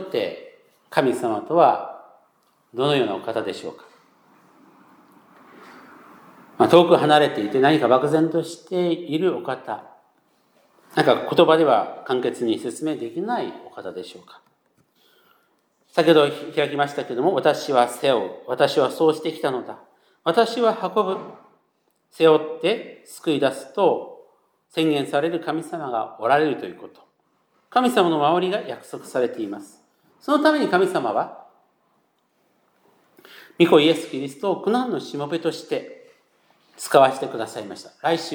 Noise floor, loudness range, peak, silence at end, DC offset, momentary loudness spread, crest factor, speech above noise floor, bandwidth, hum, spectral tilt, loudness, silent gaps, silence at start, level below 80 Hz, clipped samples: -68 dBFS; 7 LU; 0 dBFS; 0 s; under 0.1%; 16 LU; 22 dB; 48 dB; 20 kHz; none; -5.5 dB/octave; -21 LUFS; none; 0 s; -80 dBFS; under 0.1%